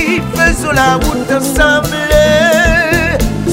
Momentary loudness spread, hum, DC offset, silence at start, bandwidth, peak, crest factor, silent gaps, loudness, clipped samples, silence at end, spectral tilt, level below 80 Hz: 5 LU; none; under 0.1%; 0 s; 16.5 kHz; 0 dBFS; 10 dB; none; -10 LUFS; under 0.1%; 0 s; -4.5 dB/octave; -20 dBFS